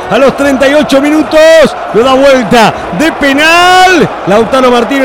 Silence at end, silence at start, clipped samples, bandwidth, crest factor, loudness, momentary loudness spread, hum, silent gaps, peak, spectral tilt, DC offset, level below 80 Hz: 0 s; 0 s; 4%; 19 kHz; 6 dB; -5 LUFS; 6 LU; none; none; 0 dBFS; -4 dB/octave; 0.8%; -34 dBFS